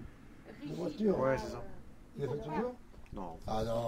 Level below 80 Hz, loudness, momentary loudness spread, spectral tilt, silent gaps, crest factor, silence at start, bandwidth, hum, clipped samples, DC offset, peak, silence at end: -52 dBFS; -37 LUFS; 21 LU; -7 dB/octave; none; 20 dB; 0 s; 16 kHz; none; under 0.1%; under 0.1%; -18 dBFS; 0 s